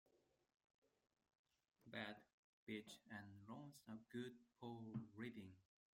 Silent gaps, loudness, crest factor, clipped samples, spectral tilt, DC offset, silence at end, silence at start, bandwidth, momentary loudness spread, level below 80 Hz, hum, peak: 0.64-0.68 s, 0.74-0.82 s, 1.39-1.44 s, 2.33-2.67 s; -57 LUFS; 24 dB; under 0.1%; -5.5 dB/octave; under 0.1%; 0.35 s; 0.15 s; 16 kHz; 7 LU; -88 dBFS; none; -36 dBFS